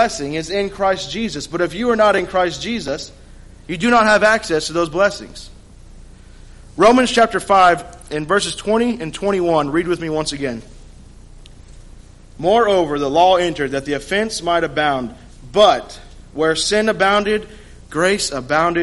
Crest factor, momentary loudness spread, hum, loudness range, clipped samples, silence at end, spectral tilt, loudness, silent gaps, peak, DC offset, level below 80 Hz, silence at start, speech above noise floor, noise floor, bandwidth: 16 dB; 13 LU; none; 5 LU; under 0.1%; 0 s; -4 dB/octave; -17 LUFS; none; -2 dBFS; under 0.1%; -42 dBFS; 0 s; 24 dB; -40 dBFS; 11.5 kHz